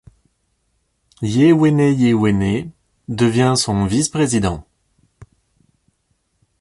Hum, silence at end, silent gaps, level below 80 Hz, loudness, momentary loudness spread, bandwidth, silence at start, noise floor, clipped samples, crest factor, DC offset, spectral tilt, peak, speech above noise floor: none; 1.35 s; none; -42 dBFS; -16 LUFS; 13 LU; 11.5 kHz; 1.2 s; -67 dBFS; under 0.1%; 16 dB; under 0.1%; -5.5 dB/octave; -4 dBFS; 52 dB